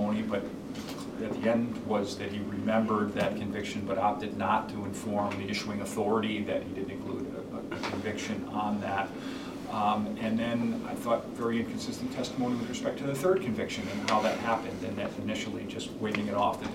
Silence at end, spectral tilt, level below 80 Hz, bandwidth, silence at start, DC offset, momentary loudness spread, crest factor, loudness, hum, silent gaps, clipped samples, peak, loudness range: 0 s; -5.5 dB/octave; -60 dBFS; 16 kHz; 0 s; under 0.1%; 8 LU; 18 dB; -32 LUFS; none; none; under 0.1%; -12 dBFS; 3 LU